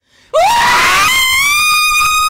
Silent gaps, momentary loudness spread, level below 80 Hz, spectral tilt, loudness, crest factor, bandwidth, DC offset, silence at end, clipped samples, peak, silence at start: none; 3 LU; -38 dBFS; 0.5 dB/octave; -9 LUFS; 10 dB; 16 kHz; under 0.1%; 0 s; under 0.1%; -2 dBFS; 0.35 s